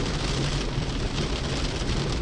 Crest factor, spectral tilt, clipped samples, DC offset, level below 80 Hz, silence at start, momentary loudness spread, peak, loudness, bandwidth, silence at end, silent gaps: 14 dB; -4.5 dB/octave; under 0.1%; under 0.1%; -32 dBFS; 0 s; 2 LU; -12 dBFS; -28 LUFS; 11.5 kHz; 0 s; none